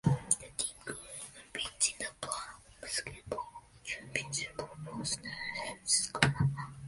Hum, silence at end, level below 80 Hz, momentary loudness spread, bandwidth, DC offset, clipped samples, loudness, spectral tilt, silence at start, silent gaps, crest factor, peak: none; 0 s; -58 dBFS; 14 LU; 11.5 kHz; under 0.1%; under 0.1%; -35 LUFS; -3 dB/octave; 0.05 s; none; 30 dB; -6 dBFS